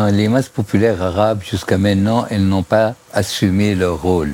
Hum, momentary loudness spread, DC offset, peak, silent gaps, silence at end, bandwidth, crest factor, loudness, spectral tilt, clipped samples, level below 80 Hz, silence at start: none; 4 LU; under 0.1%; 0 dBFS; none; 0 s; 16.5 kHz; 14 dB; -16 LUFS; -6.5 dB/octave; under 0.1%; -40 dBFS; 0 s